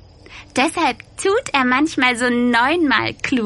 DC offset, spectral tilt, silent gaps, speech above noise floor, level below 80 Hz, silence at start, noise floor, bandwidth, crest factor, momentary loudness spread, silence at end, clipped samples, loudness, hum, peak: under 0.1%; -3.5 dB/octave; none; 24 dB; -48 dBFS; 0.3 s; -41 dBFS; 11.5 kHz; 18 dB; 5 LU; 0 s; under 0.1%; -17 LUFS; none; 0 dBFS